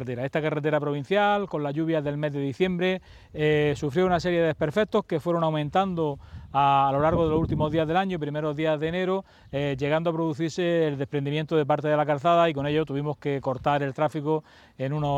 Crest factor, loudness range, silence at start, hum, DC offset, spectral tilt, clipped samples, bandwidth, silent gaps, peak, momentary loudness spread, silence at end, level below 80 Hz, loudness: 16 dB; 2 LU; 0 s; none; under 0.1%; -7 dB/octave; under 0.1%; 9.6 kHz; none; -8 dBFS; 7 LU; 0 s; -50 dBFS; -25 LUFS